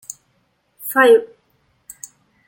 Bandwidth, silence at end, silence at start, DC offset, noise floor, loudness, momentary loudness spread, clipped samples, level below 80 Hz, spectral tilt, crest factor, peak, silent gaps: 17 kHz; 1.25 s; 0.85 s; under 0.1%; -64 dBFS; -14 LUFS; 25 LU; under 0.1%; -70 dBFS; -2 dB/octave; 18 dB; -2 dBFS; none